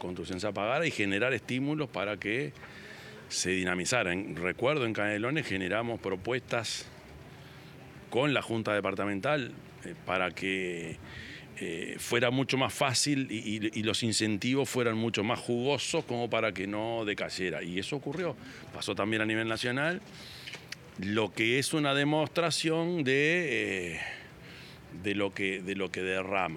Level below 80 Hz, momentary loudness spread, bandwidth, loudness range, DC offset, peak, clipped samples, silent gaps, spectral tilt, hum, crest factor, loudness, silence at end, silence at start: -66 dBFS; 17 LU; 17.5 kHz; 4 LU; under 0.1%; -12 dBFS; under 0.1%; none; -4 dB/octave; none; 20 dB; -31 LUFS; 0 s; 0 s